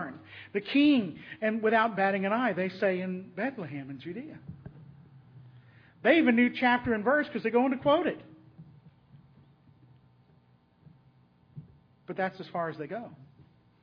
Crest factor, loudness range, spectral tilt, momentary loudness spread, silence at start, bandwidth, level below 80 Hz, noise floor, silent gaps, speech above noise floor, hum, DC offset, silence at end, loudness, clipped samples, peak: 22 dB; 13 LU; -8 dB/octave; 19 LU; 0 s; 5.4 kHz; -68 dBFS; -63 dBFS; none; 35 dB; none; under 0.1%; 0.65 s; -28 LUFS; under 0.1%; -10 dBFS